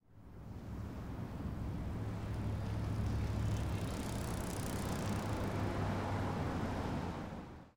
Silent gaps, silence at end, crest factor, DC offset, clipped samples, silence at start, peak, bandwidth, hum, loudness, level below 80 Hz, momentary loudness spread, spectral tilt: none; 0.05 s; 14 dB; under 0.1%; under 0.1%; 0.1 s; -26 dBFS; 18 kHz; none; -40 LUFS; -48 dBFS; 8 LU; -6.5 dB/octave